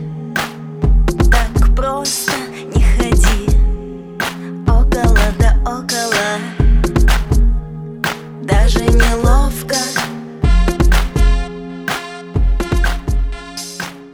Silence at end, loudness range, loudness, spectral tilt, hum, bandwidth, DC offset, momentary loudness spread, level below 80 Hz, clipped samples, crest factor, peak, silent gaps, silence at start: 0.05 s; 2 LU; -16 LUFS; -5 dB/octave; none; 15.5 kHz; under 0.1%; 10 LU; -14 dBFS; under 0.1%; 14 dB; 0 dBFS; none; 0 s